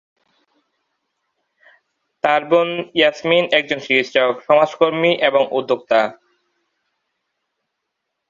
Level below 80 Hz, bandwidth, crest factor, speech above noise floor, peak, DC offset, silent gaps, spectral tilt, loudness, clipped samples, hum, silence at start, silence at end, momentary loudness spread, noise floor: -66 dBFS; 7.4 kHz; 20 dB; 61 dB; 0 dBFS; under 0.1%; none; -5 dB/octave; -17 LUFS; under 0.1%; none; 2.25 s; 2.2 s; 4 LU; -77 dBFS